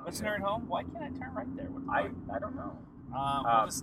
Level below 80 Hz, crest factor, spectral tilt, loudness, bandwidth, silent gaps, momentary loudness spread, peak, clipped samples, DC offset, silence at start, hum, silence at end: -56 dBFS; 20 dB; -4.5 dB/octave; -34 LUFS; 16.5 kHz; none; 13 LU; -14 dBFS; under 0.1%; under 0.1%; 0 s; none; 0 s